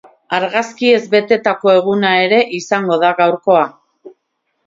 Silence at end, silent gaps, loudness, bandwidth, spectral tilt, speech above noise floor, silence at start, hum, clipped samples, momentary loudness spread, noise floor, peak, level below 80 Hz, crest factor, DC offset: 0.55 s; none; -14 LUFS; 7.8 kHz; -5 dB/octave; 56 dB; 0.3 s; none; under 0.1%; 6 LU; -69 dBFS; 0 dBFS; -64 dBFS; 14 dB; under 0.1%